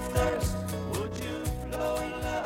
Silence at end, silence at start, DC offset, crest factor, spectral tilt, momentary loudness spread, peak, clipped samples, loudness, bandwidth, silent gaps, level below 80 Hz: 0 s; 0 s; under 0.1%; 18 dB; -5.5 dB/octave; 6 LU; -14 dBFS; under 0.1%; -32 LUFS; 17 kHz; none; -40 dBFS